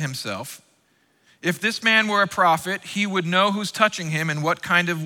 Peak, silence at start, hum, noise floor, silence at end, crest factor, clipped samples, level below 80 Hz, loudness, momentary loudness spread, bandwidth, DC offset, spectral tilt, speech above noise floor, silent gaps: -4 dBFS; 0 s; none; -64 dBFS; 0 s; 18 dB; under 0.1%; -68 dBFS; -21 LUFS; 10 LU; 19 kHz; under 0.1%; -4 dB/octave; 42 dB; none